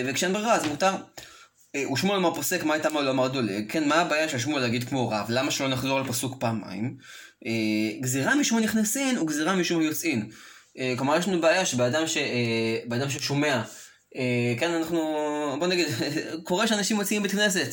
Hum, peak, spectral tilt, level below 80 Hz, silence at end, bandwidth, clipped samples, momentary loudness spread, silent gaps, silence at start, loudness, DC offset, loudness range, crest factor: none; -10 dBFS; -4 dB/octave; -66 dBFS; 0 s; 17 kHz; under 0.1%; 9 LU; none; 0 s; -25 LUFS; under 0.1%; 2 LU; 16 dB